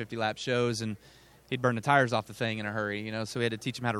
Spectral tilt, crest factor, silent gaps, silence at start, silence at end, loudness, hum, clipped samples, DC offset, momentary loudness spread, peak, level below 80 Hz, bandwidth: -5 dB/octave; 22 dB; none; 0 s; 0 s; -30 LUFS; none; under 0.1%; under 0.1%; 10 LU; -8 dBFS; -66 dBFS; 15 kHz